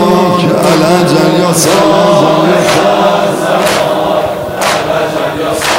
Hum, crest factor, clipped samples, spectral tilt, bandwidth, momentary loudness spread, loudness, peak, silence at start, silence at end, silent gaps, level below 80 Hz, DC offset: none; 8 dB; 1%; -4.5 dB/octave; 17 kHz; 6 LU; -9 LUFS; 0 dBFS; 0 s; 0 s; none; -42 dBFS; 0.2%